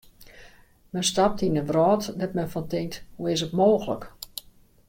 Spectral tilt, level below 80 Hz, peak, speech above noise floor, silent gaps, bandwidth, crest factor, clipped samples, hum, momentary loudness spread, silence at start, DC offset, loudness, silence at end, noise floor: -5 dB/octave; -52 dBFS; -8 dBFS; 28 dB; none; 16.5 kHz; 18 dB; under 0.1%; none; 15 LU; 0.2 s; under 0.1%; -25 LUFS; 0.5 s; -52 dBFS